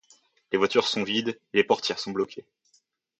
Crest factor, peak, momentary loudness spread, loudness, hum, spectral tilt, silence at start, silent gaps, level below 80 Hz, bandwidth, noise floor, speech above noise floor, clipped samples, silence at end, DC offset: 22 dB; -6 dBFS; 8 LU; -26 LUFS; none; -4 dB/octave; 0.5 s; none; -70 dBFS; 8.4 kHz; -68 dBFS; 42 dB; under 0.1%; 0.8 s; under 0.1%